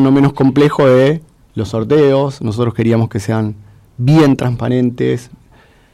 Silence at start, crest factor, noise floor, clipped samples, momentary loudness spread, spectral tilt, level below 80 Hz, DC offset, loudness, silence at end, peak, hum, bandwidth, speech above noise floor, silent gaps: 0 s; 10 dB; -46 dBFS; under 0.1%; 11 LU; -8 dB/octave; -46 dBFS; under 0.1%; -13 LUFS; 0.7 s; -4 dBFS; none; 12.5 kHz; 34 dB; none